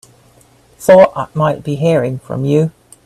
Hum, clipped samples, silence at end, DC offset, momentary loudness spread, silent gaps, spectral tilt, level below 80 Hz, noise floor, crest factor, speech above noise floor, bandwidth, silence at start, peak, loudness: none; under 0.1%; 0.35 s; under 0.1%; 12 LU; none; -7 dB/octave; -50 dBFS; -48 dBFS; 14 dB; 36 dB; 13.5 kHz; 0.8 s; 0 dBFS; -13 LUFS